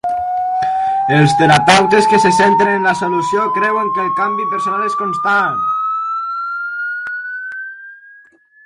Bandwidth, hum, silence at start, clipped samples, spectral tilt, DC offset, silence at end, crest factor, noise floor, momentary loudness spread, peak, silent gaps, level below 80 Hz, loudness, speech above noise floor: 11.5 kHz; none; 0.05 s; under 0.1%; -5 dB/octave; under 0.1%; 0.7 s; 14 dB; -46 dBFS; 13 LU; 0 dBFS; none; -52 dBFS; -14 LUFS; 33 dB